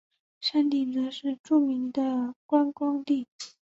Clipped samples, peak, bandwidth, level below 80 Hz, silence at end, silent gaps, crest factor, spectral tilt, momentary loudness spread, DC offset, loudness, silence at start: under 0.1%; -12 dBFS; 8 kHz; -76 dBFS; 0.15 s; 1.39-1.44 s, 2.36-2.49 s, 3.28-3.39 s; 16 dB; -4 dB/octave; 7 LU; under 0.1%; -27 LUFS; 0.4 s